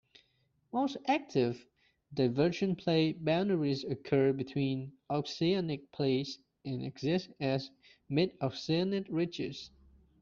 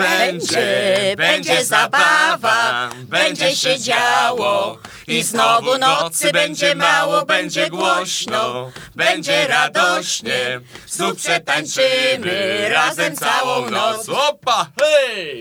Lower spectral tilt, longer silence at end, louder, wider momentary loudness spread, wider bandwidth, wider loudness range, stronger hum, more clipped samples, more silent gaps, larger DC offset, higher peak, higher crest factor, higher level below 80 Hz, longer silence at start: first, -5.5 dB/octave vs -2 dB/octave; first, 0.55 s vs 0 s; second, -33 LUFS vs -16 LUFS; first, 10 LU vs 6 LU; second, 7.4 kHz vs over 20 kHz; about the same, 3 LU vs 3 LU; neither; neither; neither; neither; second, -16 dBFS vs 0 dBFS; about the same, 18 dB vs 18 dB; second, -68 dBFS vs -62 dBFS; first, 0.75 s vs 0 s